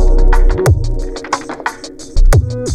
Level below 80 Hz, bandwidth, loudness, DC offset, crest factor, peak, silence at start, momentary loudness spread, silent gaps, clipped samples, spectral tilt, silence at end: -12 dBFS; 11 kHz; -16 LUFS; under 0.1%; 10 dB; -2 dBFS; 0 s; 10 LU; none; under 0.1%; -6 dB/octave; 0 s